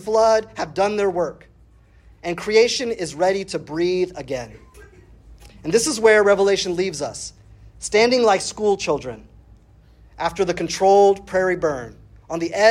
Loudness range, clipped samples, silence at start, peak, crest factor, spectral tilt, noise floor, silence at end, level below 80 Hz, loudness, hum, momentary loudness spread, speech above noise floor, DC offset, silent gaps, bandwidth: 4 LU; under 0.1%; 0 s; -2 dBFS; 18 dB; -3.5 dB/octave; -51 dBFS; 0 s; -50 dBFS; -19 LUFS; none; 16 LU; 32 dB; under 0.1%; none; 13.5 kHz